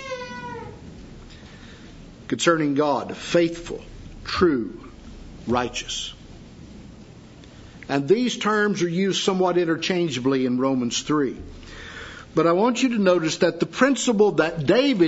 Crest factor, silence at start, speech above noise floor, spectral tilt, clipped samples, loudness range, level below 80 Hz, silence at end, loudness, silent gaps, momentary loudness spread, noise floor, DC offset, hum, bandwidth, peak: 20 dB; 0 s; 23 dB; -4.5 dB/octave; under 0.1%; 6 LU; -48 dBFS; 0 s; -22 LUFS; none; 24 LU; -44 dBFS; under 0.1%; none; 8 kHz; -4 dBFS